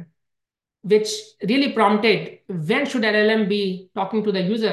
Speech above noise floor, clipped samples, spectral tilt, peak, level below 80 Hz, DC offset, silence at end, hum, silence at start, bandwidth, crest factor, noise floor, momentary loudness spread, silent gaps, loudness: 63 dB; under 0.1%; -5 dB/octave; -4 dBFS; -70 dBFS; under 0.1%; 0 s; none; 0 s; 12.5 kHz; 18 dB; -83 dBFS; 10 LU; none; -20 LUFS